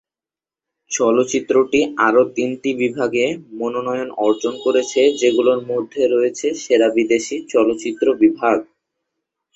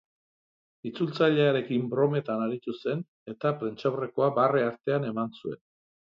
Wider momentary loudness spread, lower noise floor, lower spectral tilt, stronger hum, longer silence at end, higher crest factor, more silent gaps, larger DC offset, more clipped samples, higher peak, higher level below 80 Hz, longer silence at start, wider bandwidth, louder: second, 7 LU vs 15 LU; about the same, under -90 dBFS vs under -90 dBFS; second, -4 dB/octave vs -8.5 dB/octave; neither; first, 0.95 s vs 0.55 s; about the same, 16 dB vs 20 dB; second, none vs 3.08-3.26 s; neither; neither; first, -2 dBFS vs -10 dBFS; first, -62 dBFS vs -74 dBFS; about the same, 0.9 s vs 0.85 s; first, 8.2 kHz vs 7 kHz; first, -18 LUFS vs -28 LUFS